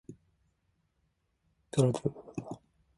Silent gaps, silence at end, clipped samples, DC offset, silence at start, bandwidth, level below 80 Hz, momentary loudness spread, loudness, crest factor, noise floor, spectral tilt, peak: none; 0.4 s; under 0.1%; under 0.1%; 0.1 s; 11.5 kHz; -68 dBFS; 18 LU; -33 LUFS; 24 dB; -77 dBFS; -7 dB/octave; -14 dBFS